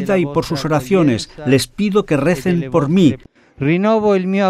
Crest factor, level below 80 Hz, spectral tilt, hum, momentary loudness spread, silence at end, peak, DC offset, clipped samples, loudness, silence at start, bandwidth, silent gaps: 14 dB; -44 dBFS; -6.5 dB/octave; none; 5 LU; 0 s; 0 dBFS; under 0.1%; under 0.1%; -16 LUFS; 0 s; 15 kHz; none